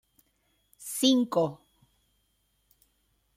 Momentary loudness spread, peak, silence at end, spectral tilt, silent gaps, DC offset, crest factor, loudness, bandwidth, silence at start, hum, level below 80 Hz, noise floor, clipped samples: 14 LU; -10 dBFS; 1.8 s; -4 dB/octave; none; under 0.1%; 22 dB; -27 LUFS; 16 kHz; 0.8 s; none; -72 dBFS; -73 dBFS; under 0.1%